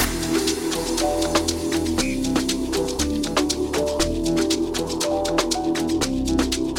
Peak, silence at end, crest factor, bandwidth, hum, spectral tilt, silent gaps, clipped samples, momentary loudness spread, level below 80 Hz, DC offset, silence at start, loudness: -4 dBFS; 0 s; 18 dB; 17.5 kHz; none; -3.5 dB/octave; none; under 0.1%; 2 LU; -36 dBFS; 0.1%; 0 s; -22 LUFS